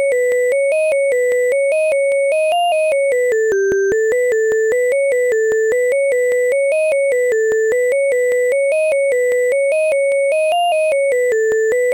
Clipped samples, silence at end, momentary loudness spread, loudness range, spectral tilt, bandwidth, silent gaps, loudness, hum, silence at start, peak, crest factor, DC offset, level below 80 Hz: under 0.1%; 0 s; 0 LU; 0 LU; -2 dB/octave; 17 kHz; none; -15 LUFS; none; 0 s; -10 dBFS; 4 dB; under 0.1%; -58 dBFS